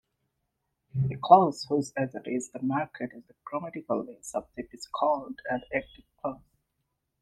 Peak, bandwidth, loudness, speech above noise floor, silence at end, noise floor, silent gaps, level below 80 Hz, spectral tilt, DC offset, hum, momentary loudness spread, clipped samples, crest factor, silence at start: -4 dBFS; 12 kHz; -29 LUFS; 52 dB; 0.85 s; -80 dBFS; none; -64 dBFS; -6 dB/octave; under 0.1%; none; 18 LU; under 0.1%; 26 dB; 0.95 s